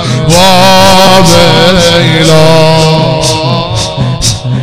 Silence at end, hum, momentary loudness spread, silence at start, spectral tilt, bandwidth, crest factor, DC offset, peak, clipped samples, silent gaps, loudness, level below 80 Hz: 0 s; none; 8 LU; 0 s; -4.5 dB/octave; 17 kHz; 6 dB; under 0.1%; 0 dBFS; 9%; none; -5 LUFS; -26 dBFS